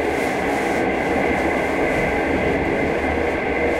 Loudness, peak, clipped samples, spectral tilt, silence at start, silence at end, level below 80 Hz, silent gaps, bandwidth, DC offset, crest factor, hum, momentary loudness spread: -20 LUFS; -8 dBFS; under 0.1%; -6 dB/octave; 0 s; 0 s; -36 dBFS; none; 16 kHz; under 0.1%; 12 dB; none; 1 LU